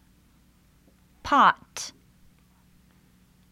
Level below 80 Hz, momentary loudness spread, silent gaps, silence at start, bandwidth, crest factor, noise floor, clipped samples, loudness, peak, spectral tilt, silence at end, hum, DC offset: -58 dBFS; 19 LU; none; 1.25 s; 15.5 kHz; 24 dB; -60 dBFS; under 0.1%; -23 LUFS; -4 dBFS; -2.5 dB/octave; 1.6 s; none; under 0.1%